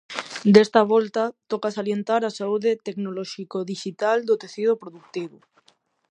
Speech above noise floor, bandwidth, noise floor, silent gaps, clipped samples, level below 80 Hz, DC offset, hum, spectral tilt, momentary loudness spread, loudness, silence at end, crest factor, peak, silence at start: 41 dB; 9.6 kHz; -63 dBFS; none; under 0.1%; -70 dBFS; under 0.1%; none; -6 dB/octave; 16 LU; -23 LUFS; 0.8 s; 22 dB; 0 dBFS; 0.1 s